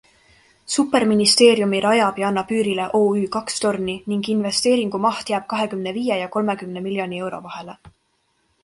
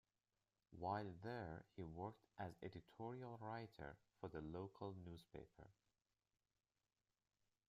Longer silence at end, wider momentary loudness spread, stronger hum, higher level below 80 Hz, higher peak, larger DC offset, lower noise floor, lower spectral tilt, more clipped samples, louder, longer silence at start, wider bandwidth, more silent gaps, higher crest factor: second, 0.75 s vs 1.95 s; about the same, 12 LU vs 11 LU; neither; first, -60 dBFS vs -76 dBFS; first, 0 dBFS vs -32 dBFS; neither; second, -67 dBFS vs under -90 dBFS; second, -4 dB/octave vs -8 dB/octave; neither; first, -20 LUFS vs -54 LUFS; about the same, 0.7 s vs 0.7 s; first, 12 kHz vs 10 kHz; neither; about the same, 20 dB vs 22 dB